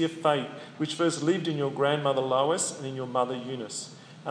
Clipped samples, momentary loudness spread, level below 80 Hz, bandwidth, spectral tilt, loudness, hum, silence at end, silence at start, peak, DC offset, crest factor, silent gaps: under 0.1%; 11 LU; -82 dBFS; 10.5 kHz; -4.5 dB/octave; -28 LUFS; none; 0 s; 0 s; -10 dBFS; under 0.1%; 18 dB; none